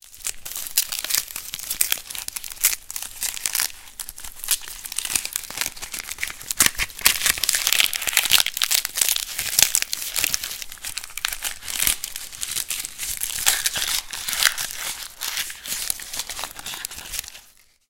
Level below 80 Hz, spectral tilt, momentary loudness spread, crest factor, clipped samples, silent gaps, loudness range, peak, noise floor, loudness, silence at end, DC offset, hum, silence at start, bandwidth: -48 dBFS; 2 dB/octave; 13 LU; 26 dB; under 0.1%; none; 7 LU; 0 dBFS; -53 dBFS; -22 LUFS; 0.45 s; under 0.1%; none; 0.05 s; 18 kHz